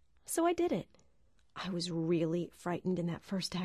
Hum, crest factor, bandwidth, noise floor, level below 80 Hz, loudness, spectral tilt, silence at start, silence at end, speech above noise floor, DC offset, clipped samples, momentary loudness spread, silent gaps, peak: none; 16 dB; 13 kHz; -72 dBFS; -66 dBFS; -35 LUFS; -5.5 dB/octave; 0.3 s; 0 s; 37 dB; under 0.1%; under 0.1%; 9 LU; none; -20 dBFS